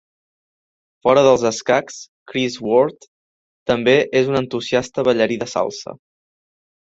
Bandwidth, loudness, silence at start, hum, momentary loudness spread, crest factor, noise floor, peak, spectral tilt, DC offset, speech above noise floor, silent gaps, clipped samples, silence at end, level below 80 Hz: 7.8 kHz; -18 LUFS; 1.05 s; none; 14 LU; 18 dB; under -90 dBFS; -2 dBFS; -4.5 dB/octave; under 0.1%; over 73 dB; 2.08-2.26 s, 3.08-3.66 s; under 0.1%; 0.9 s; -56 dBFS